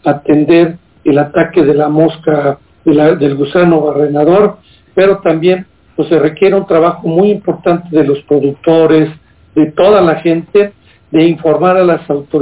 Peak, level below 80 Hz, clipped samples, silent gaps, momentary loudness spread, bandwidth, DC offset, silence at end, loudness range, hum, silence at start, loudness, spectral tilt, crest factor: 0 dBFS; -46 dBFS; under 0.1%; none; 7 LU; 4 kHz; under 0.1%; 0 s; 1 LU; none; 0.05 s; -10 LUFS; -11.5 dB/octave; 10 dB